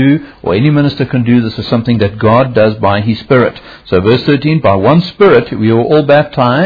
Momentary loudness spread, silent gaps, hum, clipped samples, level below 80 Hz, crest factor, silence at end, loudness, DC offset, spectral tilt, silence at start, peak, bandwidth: 6 LU; none; none; 0.3%; -40 dBFS; 10 dB; 0 s; -10 LUFS; under 0.1%; -9.5 dB/octave; 0 s; 0 dBFS; 5.4 kHz